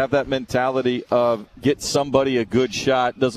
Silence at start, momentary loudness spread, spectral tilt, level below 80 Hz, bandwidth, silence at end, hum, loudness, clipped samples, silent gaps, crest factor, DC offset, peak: 0 s; 3 LU; -5 dB/octave; -48 dBFS; 14 kHz; 0 s; none; -21 LUFS; under 0.1%; none; 18 dB; under 0.1%; -2 dBFS